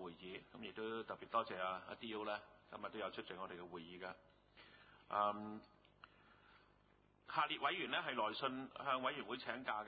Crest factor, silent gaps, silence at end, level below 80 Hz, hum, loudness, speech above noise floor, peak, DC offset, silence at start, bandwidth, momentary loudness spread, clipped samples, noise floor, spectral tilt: 22 dB; none; 0 s; -80 dBFS; none; -44 LUFS; 29 dB; -24 dBFS; under 0.1%; 0 s; 4.8 kHz; 18 LU; under 0.1%; -73 dBFS; -1 dB/octave